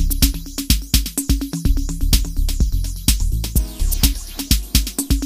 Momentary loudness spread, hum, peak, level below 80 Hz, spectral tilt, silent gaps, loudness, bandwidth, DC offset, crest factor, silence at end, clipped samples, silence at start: 5 LU; none; 0 dBFS; -20 dBFS; -3.5 dB/octave; none; -20 LUFS; 15.5 kHz; under 0.1%; 18 dB; 0 s; under 0.1%; 0 s